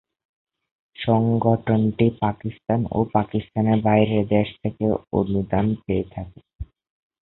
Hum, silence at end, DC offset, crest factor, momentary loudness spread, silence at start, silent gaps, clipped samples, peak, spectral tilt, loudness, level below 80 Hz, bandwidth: none; 0.55 s; under 0.1%; 20 dB; 15 LU; 1 s; 6.55-6.59 s; under 0.1%; -4 dBFS; -12.5 dB/octave; -22 LUFS; -46 dBFS; 4.1 kHz